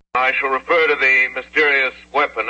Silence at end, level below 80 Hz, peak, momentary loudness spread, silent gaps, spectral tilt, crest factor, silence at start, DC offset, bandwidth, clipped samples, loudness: 0 s; -54 dBFS; -4 dBFS; 7 LU; none; -3 dB/octave; 12 dB; 0.15 s; under 0.1%; 8.6 kHz; under 0.1%; -16 LUFS